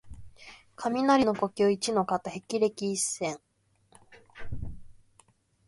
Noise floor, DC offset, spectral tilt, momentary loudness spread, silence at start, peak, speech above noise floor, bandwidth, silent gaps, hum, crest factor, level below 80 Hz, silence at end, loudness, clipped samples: -64 dBFS; under 0.1%; -4 dB/octave; 25 LU; 0.05 s; -12 dBFS; 37 dB; 11.5 kHz; none; none; 20 dB; -52 dBFS; 0.75 s; -28 LUFS; under 0.1%